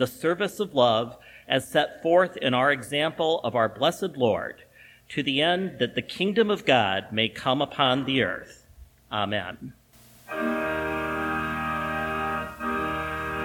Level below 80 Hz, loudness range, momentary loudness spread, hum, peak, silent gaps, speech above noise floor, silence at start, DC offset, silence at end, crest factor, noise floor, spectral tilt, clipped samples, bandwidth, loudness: -52 dBFS; 5 LU; 8 LU; none; -4 dBFS; none; 27 dB; 0 s; under 0.1%; 0 s; 22 dB; -52 dBFS; -5 dB/octave; under 0.1%; 19 kHz; -25 LUFS